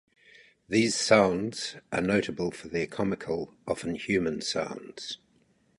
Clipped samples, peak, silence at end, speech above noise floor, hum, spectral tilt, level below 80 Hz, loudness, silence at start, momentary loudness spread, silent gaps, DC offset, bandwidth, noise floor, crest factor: under 0.1%; -6 dBFS; 0.65 s; 38 dB; none; -4 dB/octave; -58 dBFS; -29 LUFS; 0.7 s; 15 LU; none; under 0.1%; 11.5 kHz; -66 dBFS; 24 dB